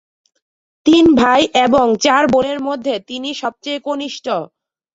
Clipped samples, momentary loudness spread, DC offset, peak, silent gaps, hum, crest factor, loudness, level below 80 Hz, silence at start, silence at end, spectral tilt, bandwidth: under 0.1%; 13 LU; under 0.1%; -2 dBFS; none; none; 14 dB; -15 LUFS; -48 dBFS; 0.85 s; 0.5 s; -4 dB/octave; 7.8 kHz